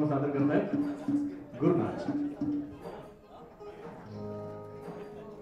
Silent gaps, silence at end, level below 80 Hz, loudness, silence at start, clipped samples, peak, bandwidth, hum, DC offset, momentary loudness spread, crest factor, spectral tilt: none; 0 s; -64 dBFS; -32 LUFS; 0 s; under 0.1%; -14 dBFS; 7.6 kHz; none; under 0.1%; 19 LU; 18 dB; -9 dB/octave